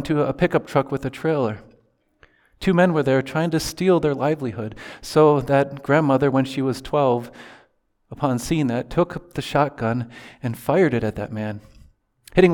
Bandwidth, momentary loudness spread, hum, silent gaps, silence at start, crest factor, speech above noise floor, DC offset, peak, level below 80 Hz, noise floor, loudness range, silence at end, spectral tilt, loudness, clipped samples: 19 kHz; 12 LU; none; none; 0 s; 20 dB; 42 dB; under 0.1%; -2 dBFS; -48 dBFS; -62 dBFS; 4 LU; 0 s; -6.5 dB/octave; -21 LUFS; under 0.1%